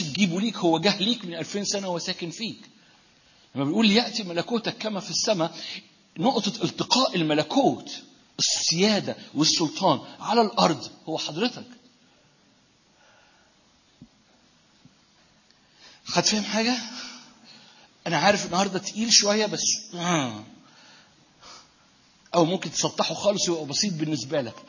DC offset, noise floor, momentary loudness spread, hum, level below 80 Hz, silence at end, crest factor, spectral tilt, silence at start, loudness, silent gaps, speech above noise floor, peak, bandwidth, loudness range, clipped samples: under 0.1%; -61 dBFS; 14 LU; none; -68 dBFS; 0.05 s; 24 dB; -3 dB/octave; 0 s; -24 LUFS; none; 36 dB; -4 dBFS; 7.4 kHz; 6 LU; under 0.1%